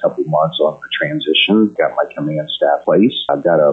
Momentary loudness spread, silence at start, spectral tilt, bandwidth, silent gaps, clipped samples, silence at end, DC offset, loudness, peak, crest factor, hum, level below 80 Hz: 7 LU; 0 s; -8 dB/octave; 4.1 kHz; none; under 0.1%; 0 s; under 0.1%; -15 LUFS; -2 dBFS; 12 dB; none; -62 dBFS